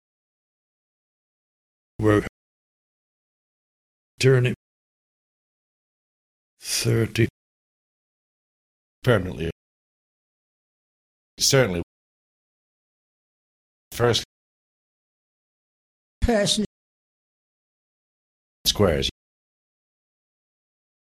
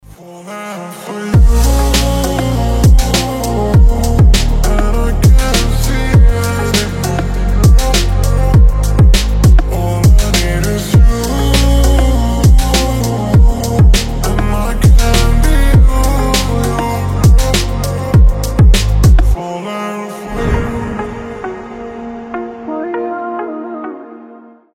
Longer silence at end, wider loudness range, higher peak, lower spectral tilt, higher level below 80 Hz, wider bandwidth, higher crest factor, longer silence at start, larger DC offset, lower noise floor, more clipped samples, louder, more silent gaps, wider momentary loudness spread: first, 1.95 s vs 0.4 s; second, 5 LU vs 9 LU; second, -4 dBFS vs 0 dBFS; about the same, -4.5 dB/octave vs -5.5 dB/octave; second, -44 dBFS vs -12 dBFS; about the same, 16 kHz vs 16.5 kHz; first, 24 dB vs 10 dB; first, 2 s vs 0.2 s; neither; first, under -90 dBFS vs -37 dBFS; neither; second, -22 LUFS vs -12 LUFS; first, 2.29-4.18 s, 4.56-6.57 s, 7.30-9.02 s, 9.52-11.37 s, 11.83-13.91 s, 14.25-16.21 s, 16.66-18.65 s vs none; about the same, 14 LU vs 13 LU